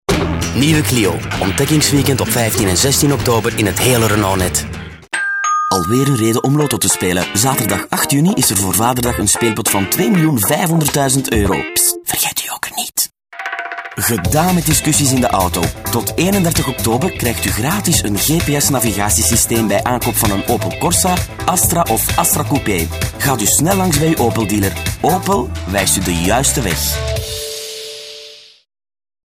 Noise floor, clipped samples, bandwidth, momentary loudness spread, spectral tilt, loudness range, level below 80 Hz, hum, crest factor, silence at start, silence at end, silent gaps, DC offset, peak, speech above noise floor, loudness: -37 dBFS; under 0.1%; 19.5 kHz; 7 LU; -4 dB/octave; 2 LU; -32 dBFS; none; 14 dB; 0.1 s; 0.85 s; none; under 0.1%; -2 dBFS; 23 dB; -14 LUFS